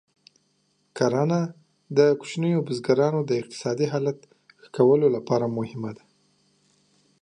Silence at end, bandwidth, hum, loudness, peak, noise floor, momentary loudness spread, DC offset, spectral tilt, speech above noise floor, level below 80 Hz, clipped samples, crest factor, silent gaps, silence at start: 1.25 s; 10 kHz; none; -24 LUFS; -6 dBFS; -69 dBFS; 13 LU; under 0.1%; -7 dB/octave; 46 dB; -70 dBFS; under 0.1%; 20 dB; none; 0.95 s